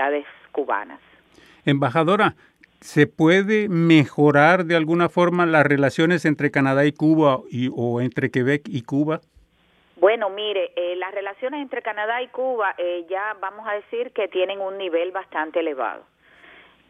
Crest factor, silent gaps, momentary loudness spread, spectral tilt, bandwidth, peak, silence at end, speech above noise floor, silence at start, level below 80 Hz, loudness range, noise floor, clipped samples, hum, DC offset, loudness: 20 dB; none; 12 LU; -7 dB/octave; 11.5 kHz; 0 dBFS; 0.9 s; 40 dB; 0 s; -68 dBFS; 9 LU; -60 dBFS; under 0.1%; none; under 0.1%; -21 LUFS